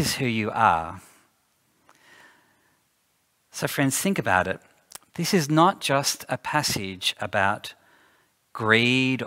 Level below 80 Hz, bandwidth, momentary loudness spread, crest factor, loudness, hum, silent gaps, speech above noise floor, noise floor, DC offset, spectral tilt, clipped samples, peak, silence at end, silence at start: -60 dBFS; 16 kHz; 19 LU; 22 dB; -23 LUFS; none; none; 46 dB; -69 dBFS; under 0.1%; -4 dB/octave; under 0.1%; -4 dBFS; 0 s; 0 s